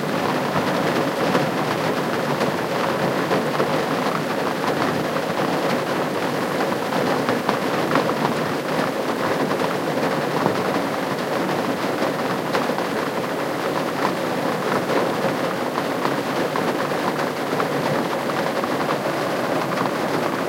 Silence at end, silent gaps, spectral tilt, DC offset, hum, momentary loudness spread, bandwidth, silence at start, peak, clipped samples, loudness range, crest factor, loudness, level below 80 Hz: 0 s; none; -5 dB/octave; under 0.1%; none; 2 LU; 16 kHz; 0 s; 0 dBFS; under 0.1%; 1 LU; 20 dB; -22 LUFS; -62 dBFS